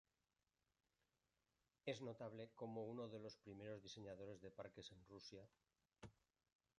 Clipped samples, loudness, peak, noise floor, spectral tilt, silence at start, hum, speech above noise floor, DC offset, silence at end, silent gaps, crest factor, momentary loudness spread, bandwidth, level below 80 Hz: under 0.1%; -56 LUFS; -34 dBFS; under -90 dBFS; -5.5 dB/octave; 1.85 s; none; over 34 dB; under 0.1%; 0.65 s; none; 24 dB; 12 LU; 10 kHz; -82 dBFS